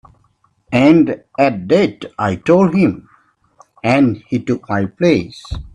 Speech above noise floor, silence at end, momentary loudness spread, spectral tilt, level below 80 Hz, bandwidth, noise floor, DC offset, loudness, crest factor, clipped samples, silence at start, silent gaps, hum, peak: 44 dB; 0.05 s; 10 LU; -7.5 dB/octave; -42 dBFS; 10 kHz; -58 dBFS; under 0.1%; -15 LUFS; 16 dB; under 0.1%; 0.7 s; none; none; 0 dBFS